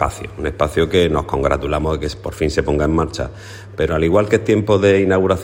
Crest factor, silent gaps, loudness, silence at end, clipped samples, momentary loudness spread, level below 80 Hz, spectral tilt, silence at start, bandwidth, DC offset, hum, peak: 16 dB; none; -17 LUFS; 0 s; under 0.1%; 12 LU; -32 dBFS; -6.5 dB/octave; 0 s; 16 kHz; under 0.1%; none; 0 dBFS